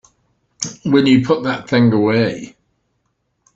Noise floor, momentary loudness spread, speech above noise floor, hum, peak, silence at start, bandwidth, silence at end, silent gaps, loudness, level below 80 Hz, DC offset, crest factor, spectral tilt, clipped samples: -68 dBFS; 14 LU; 54 dB; none; -2 dBFS; 0.6 s; 8 kHz; 1.1 s; none; -15 LUFS; -54 dBFS; under 0.1%; 16 dB; -5.5 dB/octave; under 0.1%